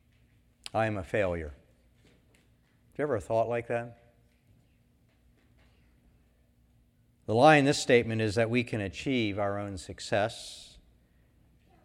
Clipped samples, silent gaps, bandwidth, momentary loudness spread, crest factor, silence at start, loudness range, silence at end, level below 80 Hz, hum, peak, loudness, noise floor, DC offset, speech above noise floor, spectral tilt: under 0.1%; none; 15 kHz; 21 LU; 24 dB; 0.75 s; 10 LU; 1.2 s; -58 dBFS; none; -8 dBFS; -28 LUFS; -66 dBFS; under 0.1%; 38 dB; -5.5 dB/octave